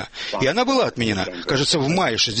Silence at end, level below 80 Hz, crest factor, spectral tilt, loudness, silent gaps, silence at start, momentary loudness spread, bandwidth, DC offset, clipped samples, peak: 0 s; -48 dBFS; 16 dB; -4 dB/octave; -20 LUFS; none; 0 s; 4 LU; 8.8 kHz; under 0.1%; under 0.1%; -6 dBFS